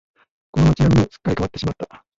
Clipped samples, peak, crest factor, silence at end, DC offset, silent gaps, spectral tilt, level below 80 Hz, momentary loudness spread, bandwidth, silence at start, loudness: under 0.1%; -4 dBFS; 14 dB; 0.35 s; under 0.1%; none; -7.5 dB/octave; -34 dBFS; 12 LU; 7.8 kHz; 0.55 s; -19 LUFS